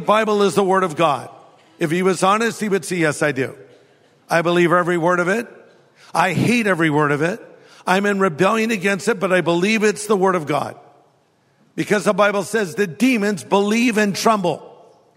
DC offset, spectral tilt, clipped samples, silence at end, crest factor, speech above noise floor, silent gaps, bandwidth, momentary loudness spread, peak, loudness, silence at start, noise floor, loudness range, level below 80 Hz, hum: under 0.1%; -5 dB/octave; under 0.1%; 0.5 s; 18 dB; 42 dB; none; 16 kHz; 8 LU; -2 dBFS; -18 LUFS; 0 s; -59 dBFS; 2 LU; -66 dBFS; none